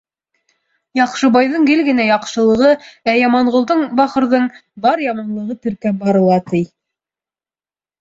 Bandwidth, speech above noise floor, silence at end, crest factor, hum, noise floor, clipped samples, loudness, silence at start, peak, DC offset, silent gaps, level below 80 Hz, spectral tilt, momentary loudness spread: 7.8 kHz; over 76 dB; 1.35 s; 14 dB; none; under -90 dBFS; under 0.1%; -15 LUFS; 0.95 s; -2 dBFS; under 0.1%; none; -56 dBFS; -6 dB/octave; 9 LU